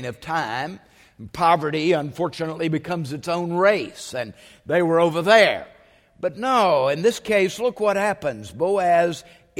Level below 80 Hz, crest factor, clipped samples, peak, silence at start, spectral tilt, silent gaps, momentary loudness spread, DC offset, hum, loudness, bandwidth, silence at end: -58 dBFS; 20 dB; under 0.1%; -2 dBFS; 0 s; -5 dB/octave; none; 12 LU; under 0.1%; none; -21 LUFS; 16 kHz; 0.4 s